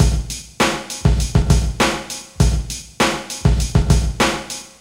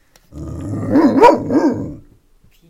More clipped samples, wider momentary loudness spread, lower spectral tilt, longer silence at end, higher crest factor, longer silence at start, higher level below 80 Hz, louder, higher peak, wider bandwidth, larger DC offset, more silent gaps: second, under 0.1% vs 0.2%; second, 9 LU vs 21 LU; second, -4.5 dB/octave vs -7.5 dB/octave; second, 0.15 s vs 0.7 s; about the same, 16 dB vs 16 dB; second, 0 s vs 0.35 s; first, -22 dBFS vs -42 dBFS; second, -18 LUFS vs -14 LUFS; about the same, -2 dBFS vs 0 dBFS; first, 16.5 kHz vs 14 kHz; neither; neither